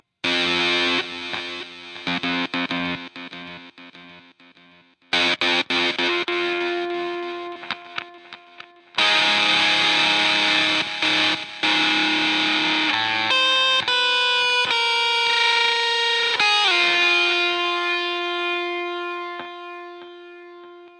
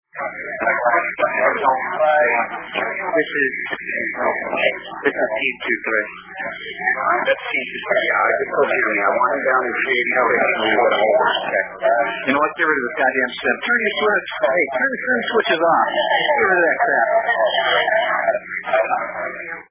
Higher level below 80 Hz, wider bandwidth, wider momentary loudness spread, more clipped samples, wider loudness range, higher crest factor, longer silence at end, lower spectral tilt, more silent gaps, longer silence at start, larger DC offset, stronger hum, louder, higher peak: second, -72 dBFS vs -60 dBFS; first, 11.5 kHz vs 3.9 kHz; first, 16 LU vs 7 LU; neither; first, 9 LU vs 4 LU; about the same, 16 dB vs 16 dB; about the same, 0.1 s vs 0.1 s; second, -2 dB/octave vs -6.5 dB/octave; neither; about the same, 0.25 s vs 0.15 s; neither; neither; about the same, -19 LUFS vs -18 LUFS; about the same, -6 dBFS vs -4 dBFS